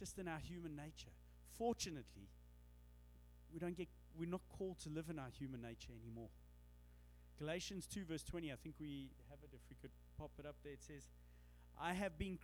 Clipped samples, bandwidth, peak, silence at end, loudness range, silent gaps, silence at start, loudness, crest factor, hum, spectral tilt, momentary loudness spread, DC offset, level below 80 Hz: under 0.1%; over 20 kHz; -30 dBFS; 0 s; 3 LU; none; 0 s; -50 LUFS; 20 dB; 60 Hz at -65 dBFS; -5 dB/octave; 21 LU; under 0.1%; -64 dBFS